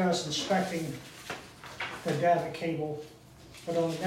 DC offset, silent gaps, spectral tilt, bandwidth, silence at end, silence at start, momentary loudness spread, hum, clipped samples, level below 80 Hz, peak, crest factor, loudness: under 0.1%; none; -4.5 dB/octave; 16 kHz; 0 s; 0 s; 16 LU; none; under 0.1%; -64 dBFS; -14 dBFS; 18 dB; -32 LUFS